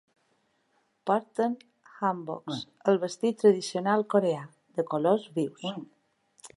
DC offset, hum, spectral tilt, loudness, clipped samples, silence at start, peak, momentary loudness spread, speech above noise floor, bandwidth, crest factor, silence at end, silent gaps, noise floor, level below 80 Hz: under 0.1%; none; -6 dB/octave; -28 LUFS; under 0.1%; 1.05 s; -10 dBFS; 13 LU; 45 dB; 11.5 kHz; 20 dB; 0.1 s; none; -72 dBFS; -80 dBFS